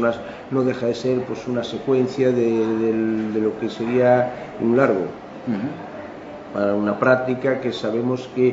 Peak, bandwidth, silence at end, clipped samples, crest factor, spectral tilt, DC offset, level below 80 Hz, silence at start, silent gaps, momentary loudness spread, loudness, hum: -2 dBFS; 7.8 kHz; 0 s; under 0.1%; 20 dB; -7.5 dB/octave; under 0.1%; -58 dBFS; 0 s; none; 12 LU; -21 LUFS; none